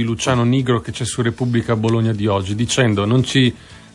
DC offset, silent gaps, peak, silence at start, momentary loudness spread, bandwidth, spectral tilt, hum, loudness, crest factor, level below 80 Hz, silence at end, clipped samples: under 0.1%; none; -2 dBFS; 0 s; 4 LU; 11.5 kHz; -5.5 dB/octave; none; -18 LUFS; 14 dB; -48 dBFS; 0.15 s; under 0.1%